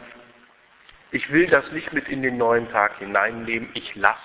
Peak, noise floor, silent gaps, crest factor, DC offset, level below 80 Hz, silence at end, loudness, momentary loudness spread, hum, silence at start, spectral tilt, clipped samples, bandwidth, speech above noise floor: 0 dBFS; -54 dBFS; none; 22 dB; under 0.1%; -58 dBFS; 0 s; -22 LUFS; 9 LU; none; 0 s; -8.5 dB/octave; under 0.1%; 4 kHz; 32 dB